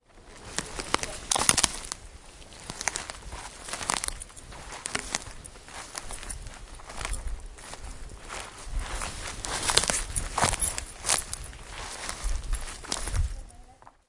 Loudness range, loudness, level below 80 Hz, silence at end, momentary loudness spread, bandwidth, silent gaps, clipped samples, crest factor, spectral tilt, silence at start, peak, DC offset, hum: 10 LU; -30 LUFS; -40 dBFS; 0.2 s; 19 LU; 12 kHz; none; under 0.1%; 32 dB; -1.5 dB/octave; 0.1 s; 0 dBFS; under 0.1%; none